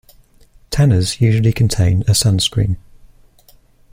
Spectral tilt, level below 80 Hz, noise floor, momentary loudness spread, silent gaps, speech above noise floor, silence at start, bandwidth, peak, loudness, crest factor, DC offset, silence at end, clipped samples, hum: -5 dB/octave; -34 dBFS; -49 dBFS; 7 LU; none; 35 dB; 0.7 s; 16 kHz; -2 dBFS; -15 LUFS; 14 dB; under 0.1%; 1.15 s; under 0.1%; none